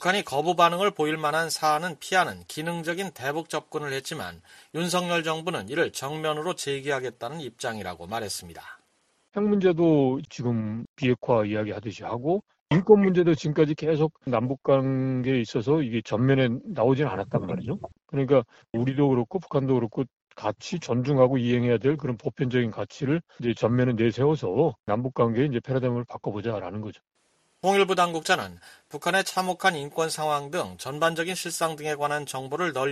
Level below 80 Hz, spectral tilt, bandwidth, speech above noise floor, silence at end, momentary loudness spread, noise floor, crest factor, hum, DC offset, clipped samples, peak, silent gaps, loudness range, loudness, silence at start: -60 dBFS; -5.5 dB/octave; 13.5 kHz; 43 dB; 0 s; 12 LU; -68 dBFS; 22 dB; none; under 0.1%; under 0.1%; -4 dBFS; 10.89-10.96 s, 12.61-12.66 s, 24.80-24.84 s; 6 LU; -26 LUFS; 0 s